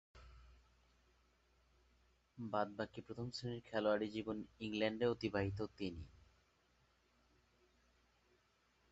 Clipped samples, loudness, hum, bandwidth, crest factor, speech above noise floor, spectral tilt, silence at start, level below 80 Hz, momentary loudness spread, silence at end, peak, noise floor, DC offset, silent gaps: under 0.1%; -42 LUFS; none; 8 kHz; 22 dB; 35 dB; -4.5 dB/octave; 0.15 s; -66 dBFS; 10 LU; 2.75 s; -24 dBFS; -77 dBFS; under 0.1%; none